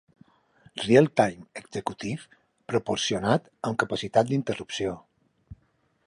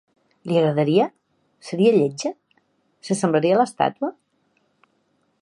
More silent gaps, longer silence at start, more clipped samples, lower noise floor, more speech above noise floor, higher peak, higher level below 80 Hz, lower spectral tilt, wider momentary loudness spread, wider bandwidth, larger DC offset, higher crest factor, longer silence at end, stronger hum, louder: neither; first, 0.75 s vs 0.45 s; neither; about the same, -68 dBFS vs -67 dBFS; second, 43 dB vs 48 dB; about the same, -6 dBFS vs -4 dBFS; first, -60 dBFS vs -72 dBFS; about the same, -5 dB/octave vs -6 dB/octave; about the same, 16 LU vs 14 LU; about the same, 11.5 kHz vs 11 kHz; neither; about the same, 22 dB vs 18 dB; second, 0.55 s vs 1.3 s; neither; second, -26 LUFS vs -21 LUFS